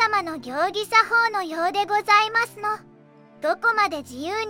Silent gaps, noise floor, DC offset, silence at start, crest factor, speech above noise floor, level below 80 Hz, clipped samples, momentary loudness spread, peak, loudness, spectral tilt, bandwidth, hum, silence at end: none; -50 dBFS; under 0.1%; 0 s; 18 dB; 28 dB; -68 dBFS; under 0.1%; 12 LU; -4 dBFS; -22 LUFS; -2.5 dB/octave; 16.5 kHz; none; 0 s